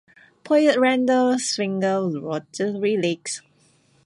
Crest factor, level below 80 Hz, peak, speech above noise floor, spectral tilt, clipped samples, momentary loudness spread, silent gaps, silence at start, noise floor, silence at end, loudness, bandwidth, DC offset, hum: 16 dB; -72 dBFS; -6 dBFS; 39 dB; -4.5 dB/octave; under 0.1%; 11 LU; none; 0.45 s; -60 dBFS; 0.65 s; -21 LUFS; 11.5 kHz; under 0.1%; none